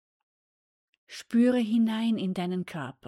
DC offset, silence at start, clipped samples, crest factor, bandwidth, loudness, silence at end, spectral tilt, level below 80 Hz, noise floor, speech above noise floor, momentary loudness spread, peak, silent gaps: under 0.1%; 1.1 s; under 0.1%; 14 dB; 12 kHz; -27 LUFS; 0.15 s; -6.5 dB/octave; -74 dBFS; under -90 dBFS; over 63 dB; 15 LU; -14 dBFS; none